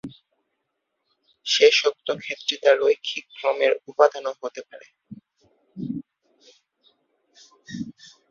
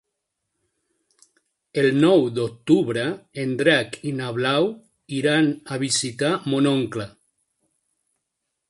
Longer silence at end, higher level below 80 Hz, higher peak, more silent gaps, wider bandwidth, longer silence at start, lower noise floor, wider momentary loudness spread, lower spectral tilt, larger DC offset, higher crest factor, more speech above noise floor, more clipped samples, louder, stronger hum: second, 0.4 s vs 1.6 s; second, -70 dBFS vs -64 dBFS; about the same, -2 dBFS vs -4 dBFS; neither; second, 7.6 kHz vs 11.5 kHz; second, 0.05 s vs 1.75 s; about the same, -78 dBFS vs -79 dBFS; first, 19 LU vs 11 LU; second, -2.5 dB/octave vs -5 dB/octave; neither; about the same, 22 dB vs 20 dB; about the same, 56 dB vs 58 dB; neither; about the same, -22 LUFS vs -22 LUFS; neither